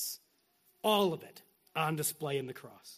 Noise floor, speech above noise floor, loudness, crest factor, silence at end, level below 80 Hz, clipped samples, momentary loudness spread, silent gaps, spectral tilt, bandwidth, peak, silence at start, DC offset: -72 dBFS; 38 dB; -34 LUFS; 20 dB; 0 s; -80 dBFS; under 0.1%; 18 LU; none; -3.5 dB/octave; 15.5 kHz; -16 dBFS; 0 s; under 0.1%